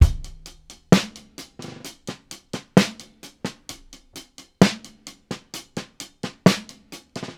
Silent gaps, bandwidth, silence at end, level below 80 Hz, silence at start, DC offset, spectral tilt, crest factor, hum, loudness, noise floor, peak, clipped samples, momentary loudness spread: none; 16 kHz; 0.05 s; -32 dBFS; 0 s; under 0.1%; -5.5 dB/octave; 24 dB; none; -23 LUFS; -46 dBFS; 0 dBFS; under 0.1%; 23 LU